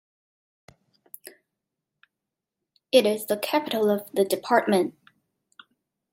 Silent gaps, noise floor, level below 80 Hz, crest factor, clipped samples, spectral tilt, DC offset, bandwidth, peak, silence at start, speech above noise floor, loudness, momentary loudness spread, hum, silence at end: none; -86 dBFS; -78 dBFS; 22 dB; under 0.1%; -4 dB/octave; under 0.1%; 16.5 kHz; -4 dBFS; 2.95 s; 64 dB; -24 LUFS; 23 LU; none; 1.2 s